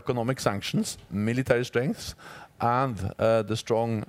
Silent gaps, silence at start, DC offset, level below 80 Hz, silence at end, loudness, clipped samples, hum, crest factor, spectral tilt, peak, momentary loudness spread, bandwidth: none; 0.05 s; under 0.1%; -56 dBFS; 0.05 s; -27 LUFS; under 0.1%; none; 18 dB; -5.5 dB/octave; -8 dBFS; 9 LU; 16 kHz